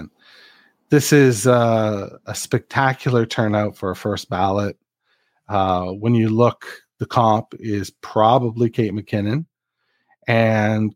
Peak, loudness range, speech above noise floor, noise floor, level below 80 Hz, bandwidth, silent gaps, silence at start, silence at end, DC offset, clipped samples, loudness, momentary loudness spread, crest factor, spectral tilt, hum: -2 dBFS; 4 LU; 53 dB; -71 dBFS; -58 dBFS; 16.5 kHz; none; 0 s; 0.05 s; under 0.1%; under 0.1%; -19 LUFS; 11 LU; 18 dB; -6 dB/octave; none